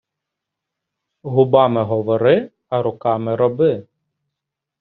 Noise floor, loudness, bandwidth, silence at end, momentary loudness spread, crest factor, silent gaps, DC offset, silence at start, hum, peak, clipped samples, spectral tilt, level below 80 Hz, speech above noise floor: -82 dBFS; -17 LUFS; 4.3 kHz; 1 s; 8 LU; 18 dB; none; under 0.1%; 1.25 s; none; 0 dBFS; under 0.1%; -6.5 dB/octave; -60 dBFS; 66 dB